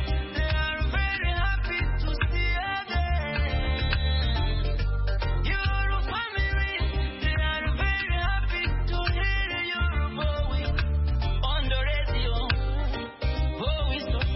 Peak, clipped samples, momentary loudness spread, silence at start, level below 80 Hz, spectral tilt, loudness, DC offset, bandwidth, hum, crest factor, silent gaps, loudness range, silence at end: -10 dBFS; under 0.1%; 3 LU; 0 s; -28 dBFS; -9.5 dB/octave; -27 LUFS; under 0.1%; 5.8 kHz; none; 14 dB; none; 1 LU; 0 s